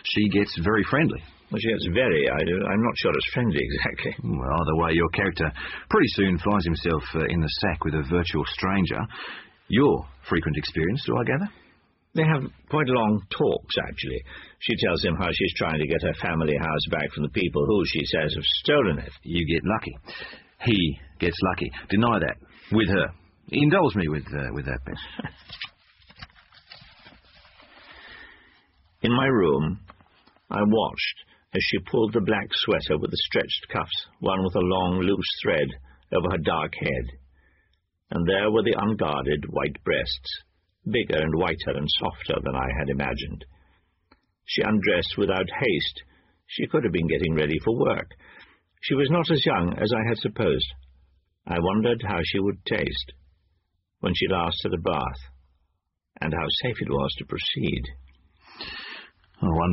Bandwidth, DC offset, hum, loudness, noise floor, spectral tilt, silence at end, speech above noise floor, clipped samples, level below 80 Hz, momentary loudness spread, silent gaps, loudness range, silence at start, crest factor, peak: 6 kHz; under 0.1%; none; -25 LUFS; -76 dBFS; -4 dB/octave; 0 s; 52 dB; under 0.1%; -44 dBFS; 12 LU; none; 4 LU; 0.05 s; 18 dB; -8 dBFS